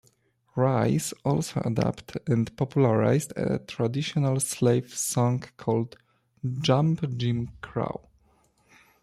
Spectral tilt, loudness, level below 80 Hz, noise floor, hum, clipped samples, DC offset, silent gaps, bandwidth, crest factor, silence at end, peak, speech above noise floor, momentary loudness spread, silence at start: -6 dB/octave; -27 LUFS; -58 dBFS; -65 dBFS; none; under 0.1%; under 0.1%; none; 15 kHz; 18 dB; 1.05 s; -10 dBFS; 40 dB; 10 LU; 0.55 s